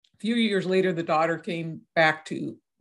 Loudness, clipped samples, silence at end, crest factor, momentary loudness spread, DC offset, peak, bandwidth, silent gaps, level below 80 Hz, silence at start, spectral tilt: -25 LUFS; under 0.1%; 0.25 s; 18 dB; 11 LU; under 0.1%; -8 dBFS; 11.5 kHz; none; -76 dBFS; 0.25 s; -6 dB/octave